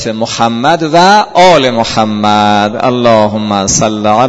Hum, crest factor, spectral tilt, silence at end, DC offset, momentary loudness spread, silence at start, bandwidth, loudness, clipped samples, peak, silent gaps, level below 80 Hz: none; 8 dB; -4 dB/octave; 0 s; under 0.1%; 6 LU; 0 s; 11 kHz; -8 LUFS; 1%; 0 dBFS; none; -40 dBFS